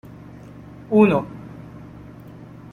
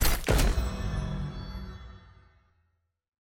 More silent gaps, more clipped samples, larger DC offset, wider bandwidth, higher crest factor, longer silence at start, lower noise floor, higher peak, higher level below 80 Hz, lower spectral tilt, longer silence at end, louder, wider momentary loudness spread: neither; neither; neither; second, 10.5 kHz vs 17 kHz; about the same, 20 dB vs 20 dB; first, 0.9 s vs 0 s; second, -41 dBFS vs -75 dBFS; first, -2 dBFS vs -10 dBFS; second, -52 dBFS vs -32 dBFS; first, -9 dB/octave vs -4.5 dB/octave; second, 0.3 s vs 1.25 s; first, -18 LUFS vs -31 LUFS; first, 25 LU vs 19 LU